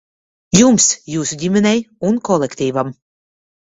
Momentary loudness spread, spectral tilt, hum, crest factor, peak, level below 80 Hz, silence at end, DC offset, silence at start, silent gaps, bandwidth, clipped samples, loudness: 10 LU; -4 dB/octave; none; 16 dB; 0 dBFS; -50 dBFS; 0.75 s; under 0.1%; 0.55 s; none; 8 kHz; under 0.1%; -15 LUFS